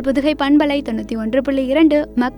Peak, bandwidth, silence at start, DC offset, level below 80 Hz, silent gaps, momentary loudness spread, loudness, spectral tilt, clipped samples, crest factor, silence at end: -2 dBFS; 18 kHz; 0 s; under 0.1%; -40 dBFS; none; 7 LU; -16 LUFS; -6 dB/octave; under 0.1%; 14 dB; 0 s